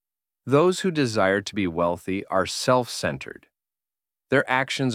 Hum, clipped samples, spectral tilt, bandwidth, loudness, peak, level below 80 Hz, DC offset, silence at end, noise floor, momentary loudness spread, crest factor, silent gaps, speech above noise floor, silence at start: none; under 0.1%; -5 dB/octave; 16 kHz; -23 LUFS; -4 dBFS; -58 dBFS; under 0.1%; 0 s; under -90 dBFS; 9 LU; 20 dB; none; over 67 dB; 0.45 s